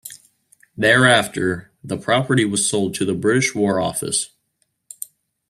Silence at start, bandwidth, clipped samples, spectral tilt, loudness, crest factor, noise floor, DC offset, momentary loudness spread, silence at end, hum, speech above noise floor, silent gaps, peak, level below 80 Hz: 0.05 s; 15.5 kHz; under 0.1%; -3.5 dB/octave; -18 LUFS; 20 dB; -69 dBFS; under 0.1%; 20 LU; 1.25 s; none; 51 dB; none; 0 dBFS; -56 dBFS